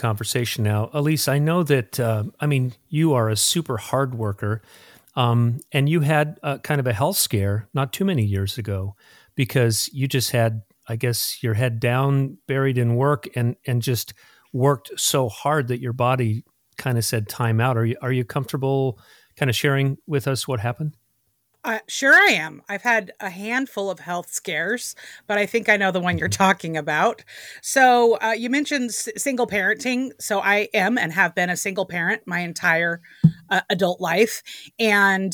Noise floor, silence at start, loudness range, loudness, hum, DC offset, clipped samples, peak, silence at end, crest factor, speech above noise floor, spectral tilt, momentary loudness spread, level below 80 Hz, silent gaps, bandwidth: -69 dBFS; 0 s; 3 LU; -21 LUFS; none; under 0.1%; under 0.1%; -2 dBFS; 0 s; 20 dB; 47 dB; -4.5 dB/octave; 9 LU; -60 dBFS; none; 19 kHz